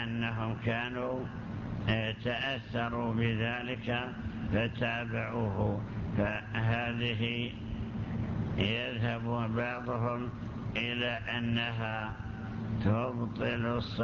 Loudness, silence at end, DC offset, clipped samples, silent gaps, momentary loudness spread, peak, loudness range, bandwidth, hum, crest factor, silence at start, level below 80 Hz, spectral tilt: -34 LUFS; 0 s; under 0.1%; under 0.1%; none; 7 LU; -14 dBFS; 1 LU; 6.8 kHz; none; 18 dB; 0 s; -48 dBFS; -7.5 dB/octave